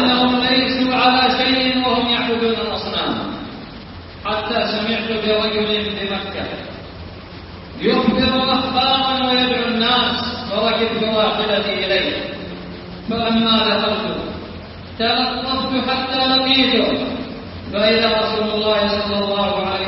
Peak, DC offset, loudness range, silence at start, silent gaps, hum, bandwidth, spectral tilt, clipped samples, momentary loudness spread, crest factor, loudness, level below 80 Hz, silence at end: -2 dBFS; under 0.1%; 4 LU; 0 s; none; none; 5.8 kHz; -8.5 dB/octave; under 0.1%; 17 LU; 16 dB; -17 LUFS; -44 dBFS; 0 s